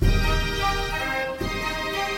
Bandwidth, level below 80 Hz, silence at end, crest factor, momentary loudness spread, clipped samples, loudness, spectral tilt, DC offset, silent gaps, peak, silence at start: 16.5 kHz; -28 dBFS; 0 s; 16 dB; 4 LU; under 0.1%; -25 LUFS; -4.5 dB/octave; under 0.1%; none; -8 dBFS; 0 s